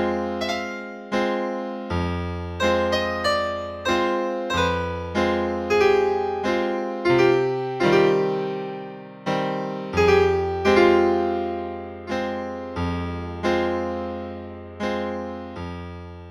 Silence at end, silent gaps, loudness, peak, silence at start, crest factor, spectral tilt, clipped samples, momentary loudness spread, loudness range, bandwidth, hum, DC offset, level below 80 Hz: 0 s; none; -23 LUFS; -4 dBFS; 0 s; 18 dB; -6 dB/octave; under 0.1%; 15 LU; 7 LU; 13 kHz; none; under 0.1%; -46 dBFS